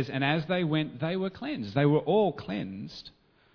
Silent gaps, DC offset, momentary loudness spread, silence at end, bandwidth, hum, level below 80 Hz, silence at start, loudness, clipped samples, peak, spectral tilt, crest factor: none; under 0.1%; 14 LU; 0.45 s; 5.4 kHz; none; -62 dBFS; 0 s; -29 LUFS; under 0.1%; -12 dBFS; -8 dB/octave; 18 dB